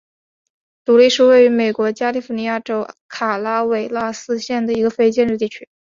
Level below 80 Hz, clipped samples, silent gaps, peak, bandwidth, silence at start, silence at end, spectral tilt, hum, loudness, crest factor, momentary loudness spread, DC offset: -60 dBFS; under 0.1%; 3.01-3.09 s; -2 dBFS; 7.6 kHz; 0.9 s; 0.3 s; -4.5 dB/octave; none; -17 LUFS; 16 dB; 13 LU; under 0.1%